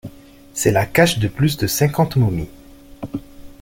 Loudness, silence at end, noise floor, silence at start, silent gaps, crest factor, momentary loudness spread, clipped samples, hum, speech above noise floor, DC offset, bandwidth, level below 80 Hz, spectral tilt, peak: -18 LUFS; 0.1 s; -42 dBFS; 0.05 s; none; 18 dB; 17 LU; under 0.1%; none; 25 dB; under 0.1%; 17 kHz; -42 dBFS; -5 dB/octave; -2 dBFS